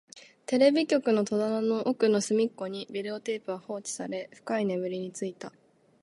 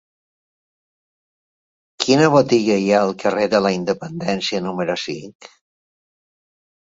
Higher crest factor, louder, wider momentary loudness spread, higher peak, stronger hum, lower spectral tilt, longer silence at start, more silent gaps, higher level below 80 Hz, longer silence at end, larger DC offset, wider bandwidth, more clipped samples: about the same, 18 dB vs 18 dB; second, -29 LUFS vs -18 LUFS; first, 13 LU vs 10 LU; second, -10 dBFS vs -2 dBFS; neither; about the same, -4.5 dB/octave vs -5 dB/octave; second, 0.15 s vs 2 s; second, none vs 5.35-5.40 s; second, -80 dBFS vs -60 dBFS; second, 0.55 s vs 1.35 s; neither; first, 11.5 kHz vs 8 kHz; neither